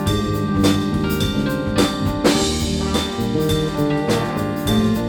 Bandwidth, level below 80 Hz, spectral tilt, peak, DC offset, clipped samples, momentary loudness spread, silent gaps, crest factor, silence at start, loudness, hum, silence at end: over 20 kHz; -34 dBFS; -5.5 dB/octave; -2 dBFS; under 0.1%; under 0.1%; 3 LU; none; 16 dB; 0 s; -19 LUFS; none; 0 s